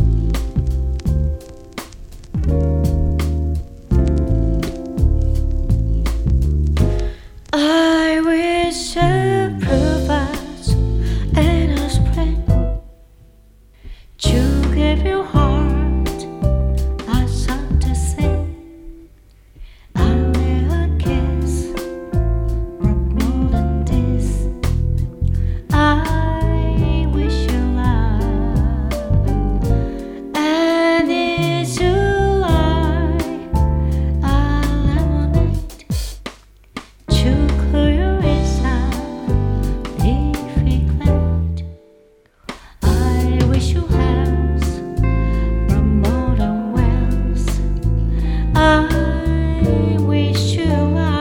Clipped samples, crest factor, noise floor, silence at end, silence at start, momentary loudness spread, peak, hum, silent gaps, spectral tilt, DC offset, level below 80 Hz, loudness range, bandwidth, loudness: under 0.1%; 16 dB; -51 dBFS; 0 s; 0 s; 8 LU; 0 dBFS; none; none; -6.5 dB/octave; under 0.1%; -20 dBFS; 3 LU; 15.5 kHz; -18 LUFS